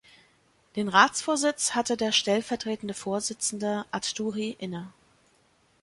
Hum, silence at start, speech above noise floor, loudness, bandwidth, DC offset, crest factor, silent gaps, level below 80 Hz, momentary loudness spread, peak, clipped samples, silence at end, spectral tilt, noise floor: none; 0.75 s; 38 dB; -27 LUFS; 11.5 kHz; under 0.1%; 24 dB; none; -68 dBFS; 14 LU; -4 dBFS; under 0.1%; 0.95 s; -2.5 dB/octave; -65 dBFS